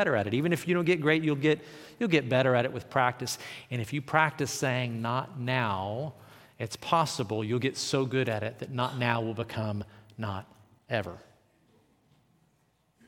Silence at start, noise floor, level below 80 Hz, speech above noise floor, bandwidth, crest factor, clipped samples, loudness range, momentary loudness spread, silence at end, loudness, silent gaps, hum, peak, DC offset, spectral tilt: 0 s; -70 dBFS; -70 dBFS; 41 dB; 17 kHz; 24 dB; under 0.1%; 8 LU; 12 LU; 1.9 s; -29 LUFS; none; none; -6 dBFS; under 0.1%; -5.5 dB/octave